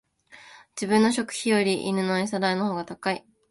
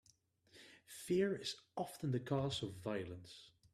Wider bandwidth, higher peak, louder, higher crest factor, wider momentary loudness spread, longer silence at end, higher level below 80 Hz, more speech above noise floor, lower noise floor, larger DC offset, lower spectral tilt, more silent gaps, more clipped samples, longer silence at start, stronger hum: second, 11.5 kHz vs 14.5 kHz; first, -8 dBFS vs -24 dBFS; first, -25 LUFS vs -41 LUFS; about the same, 18 dB vs 18 dB; second, 10 LU vs 21 LU; about the same, 0.3 s vs 0.25 s; first, -66 dBFS vs -74 dBFS; second, 27 dB vs 32 dB; second, -51 dBFS vs -73 dBFS; neither; about the same, -4.5 dB/octave vs -5.5 dB/octave; neither; neither; second, 0.3 s vs 0.55 s; neither